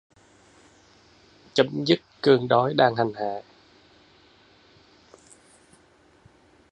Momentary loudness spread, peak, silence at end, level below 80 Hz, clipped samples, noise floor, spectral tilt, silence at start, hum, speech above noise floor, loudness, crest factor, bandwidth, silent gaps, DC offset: 12 LU; -4 dBFS; 3.3 s; -68 dBFS; under 0.1%; -58 dBFS; -6 dB/octave; 1.55 s; none; 37 dB; -23 LUFS; 24 dB; 10.5 kHz; none; under 0.1%